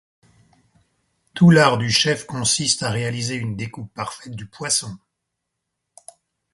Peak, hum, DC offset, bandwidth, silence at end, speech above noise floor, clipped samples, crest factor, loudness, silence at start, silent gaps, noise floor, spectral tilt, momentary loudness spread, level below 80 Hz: 0 dBFS; none; under 0.1%; 11.5 kHz; 1.6 s; 59 dB; under 0.1%; 22 dB; -19 LUFS; 1.35 s; none; -79 dBFS; -4 dB/octave; 18 LU; -56 dBFS